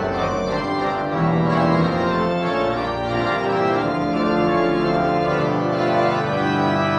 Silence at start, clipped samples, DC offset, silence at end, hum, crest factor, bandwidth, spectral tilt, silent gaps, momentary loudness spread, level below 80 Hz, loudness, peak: 0 s; under 0.1%; under 0.1%; 0 s; none; 14 dB; 8.8 kHz; -7 dB/octave; none; 4 LU; -44 dBFS; -20 LUFS; -6 dBFS